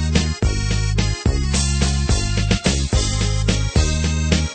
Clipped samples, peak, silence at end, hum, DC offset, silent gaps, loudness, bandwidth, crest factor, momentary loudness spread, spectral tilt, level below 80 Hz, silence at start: under 0.1%; -2 dBFS; 0 s; none; under 0.1%; none; -19 LUFS; 9.2 kHz; 16 dB; 2 LU; -4.5 dB/octave; -22 dBFS; 0 s